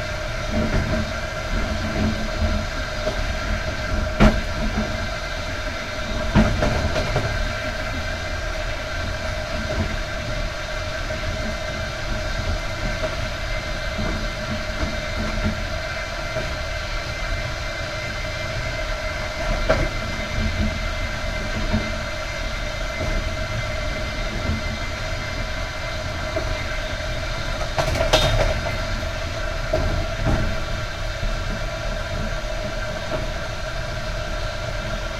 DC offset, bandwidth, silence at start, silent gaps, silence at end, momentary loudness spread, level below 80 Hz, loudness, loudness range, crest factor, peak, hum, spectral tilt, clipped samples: under 0.1%; 14 kHz; 0 s; none; 0 s; 6 LU; -28 dBFS; -25 LUFS; 4 LU; 22 dB; -2 dBFS; none; -5 dB/octave; under 0.1%